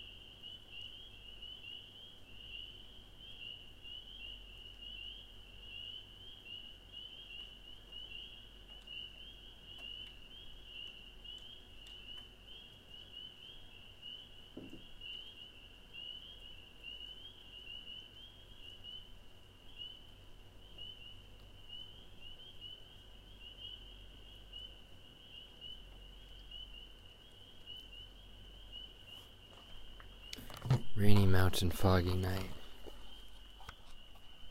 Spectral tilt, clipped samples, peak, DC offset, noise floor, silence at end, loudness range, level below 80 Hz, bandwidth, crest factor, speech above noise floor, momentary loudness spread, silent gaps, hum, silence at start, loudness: -5.5 dB/octave; under 0.1%; -12 dBFS; under 0.1%; -57 dBFS; 0 s; 17 LU; -54 dBFS; 16 kHz; 28 dB; 27 dB; 18 LU; none; none; 0 s; -44 LUFS